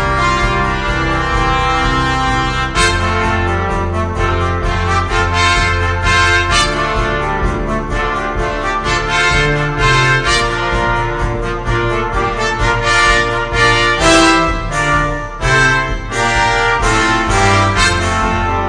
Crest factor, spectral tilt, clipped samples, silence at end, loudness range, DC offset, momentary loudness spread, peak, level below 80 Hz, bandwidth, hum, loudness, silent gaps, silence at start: 14 dB; -4 dB/octave; under 0.1%; 0 s; 3 LU; under 0.1%; 7 LU; 0 dBFS; -22 dBFS; 10 kHz; none; -13 LUFS; none; 0 s